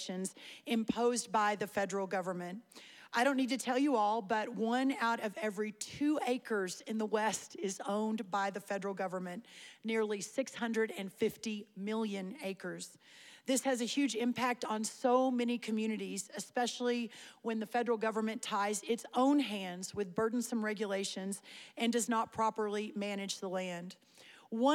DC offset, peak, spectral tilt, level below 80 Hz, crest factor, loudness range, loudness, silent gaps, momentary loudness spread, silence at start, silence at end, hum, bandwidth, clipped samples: under 0.1%; -18 dBFS; -4 dB/octave; -80 dBFS; 18 dB; 4 LU; -36 LUFS; none; 11 LU; 0 s; 0 s; none; 17 kHz; under 0.1%